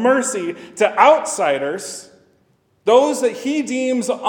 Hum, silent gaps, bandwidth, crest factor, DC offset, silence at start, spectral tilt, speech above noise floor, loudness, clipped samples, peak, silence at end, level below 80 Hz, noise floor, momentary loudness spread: none; none; 18 kHz; 18 dB; under 0.1%; 0 s; -3 dB/octave; 43 dB; -17 LUFS; under 0.1%; 0 dBFS; 0 s; -74 dBFS; -60 dBFS; 14 LU